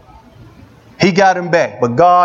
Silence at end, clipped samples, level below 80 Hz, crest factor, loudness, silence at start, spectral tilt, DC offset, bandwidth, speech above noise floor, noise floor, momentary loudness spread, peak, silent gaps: 0 s; under 0.1%; -50 dBFS; 14 dB; -13 LUFS; 1 s; -5.5 dB/octave; under 0.1%; 7.6 kHz; 31 dB; -41 dBFS; 5 LU; 0 dBFS; none